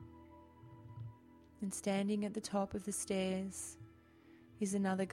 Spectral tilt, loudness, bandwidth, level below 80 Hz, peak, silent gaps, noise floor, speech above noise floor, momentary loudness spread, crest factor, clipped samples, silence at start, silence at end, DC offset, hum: -5 dB/octave; -39 LUFS; 14.5 kHz; -68 dBFS; -24 dBFS; none; -63 dBFS; 25 dB; 22 LU; 16 dB; under 0.1%; 0 s; 0 s; under 0.1%; none